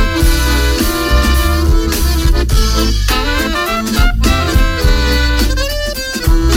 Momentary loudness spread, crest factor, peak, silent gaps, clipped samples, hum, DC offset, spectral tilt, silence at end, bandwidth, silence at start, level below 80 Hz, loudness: 3 LU; 10 dB; 0 dBFS; none; under 0.1%; none; under 0.1%; -4.5 dB/octave; 0 s; 16.5 kHz; 0 s; -14 dBFS; -13 LUFS